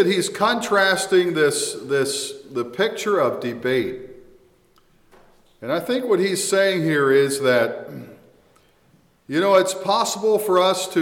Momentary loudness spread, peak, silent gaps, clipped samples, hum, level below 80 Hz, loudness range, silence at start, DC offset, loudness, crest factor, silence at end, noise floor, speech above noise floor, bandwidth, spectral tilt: 11 LU; -6 dBFS; none; under 0.1%; none; -64 dBFS; 5 LU; 0 s; under 0.1%; -20 LUFS; 16 dB; 0 s; -58 dBFS; 38 dB; 17 kHz; -3.5 dB/octave